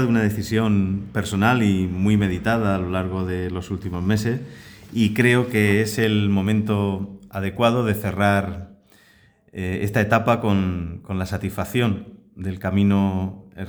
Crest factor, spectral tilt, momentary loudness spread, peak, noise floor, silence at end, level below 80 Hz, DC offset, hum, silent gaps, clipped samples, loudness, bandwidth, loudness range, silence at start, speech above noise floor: 18 dB; -6.5 dB/octave; 12 LU; -2 dBFS; -55 dBFS; 0 s; -46 dBFS; under 0.1%; none; none; under 0.1%; -22 LUFS; over 20 kHz; 3 LU; 0 s; 35 dB